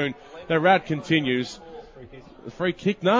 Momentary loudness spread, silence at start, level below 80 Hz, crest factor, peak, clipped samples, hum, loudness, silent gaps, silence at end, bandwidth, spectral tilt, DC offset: 23 LU; 0 s; -58 dBFS; 18 dB; -8 dBFS; under 0.1%; none; -23 LUFS; none; 0 s; 7.8 kHz; -6 dB/octave; under 0.1%